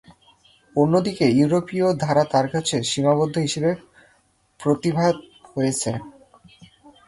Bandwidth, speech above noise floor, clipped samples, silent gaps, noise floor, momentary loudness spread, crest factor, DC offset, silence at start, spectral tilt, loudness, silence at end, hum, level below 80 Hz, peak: 11.5 kHz; 42 dB; under 0.1%; none; -62 dBFS; 9 LU; 16 dB; under 0.1%; 0.1 s; -5.5 dB/octave; -21 LUFS; 0.4 s; none; -58 dBFS; -6 dBFS